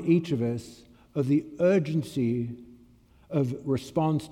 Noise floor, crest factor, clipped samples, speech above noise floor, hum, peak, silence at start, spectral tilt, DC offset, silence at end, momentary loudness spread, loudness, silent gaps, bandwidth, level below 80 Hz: -57 dBFS; 16 dB; under 0.1%; 31 dB; none; -12 dBFS; 0 s; -8 dB/octave; under 0.1%; 0 s; 12 LU; -28 LUFS; none; 15 kHz; -62 dBFS